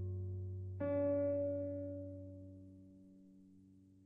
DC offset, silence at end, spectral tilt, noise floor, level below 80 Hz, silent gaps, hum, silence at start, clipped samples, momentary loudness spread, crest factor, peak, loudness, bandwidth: under 0.1%; 0 s; -12 dB/octave; -64 dBFS; -74 dBFS; none; none; 0 s; under 0.1%; 25 LU; 14 dB; -28 dBFS; -41 LUFS; 3.4 kHz